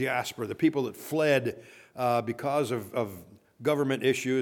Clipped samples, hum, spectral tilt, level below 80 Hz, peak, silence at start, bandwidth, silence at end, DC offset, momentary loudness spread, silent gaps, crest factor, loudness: under 0.1%; none; -5.5 dB/octave; -72 dBFS; -12 dBFS; 0 s; 19 kHz; 0 s; under 0.1%; 11 LU; none; 18 dB; -29 LUFS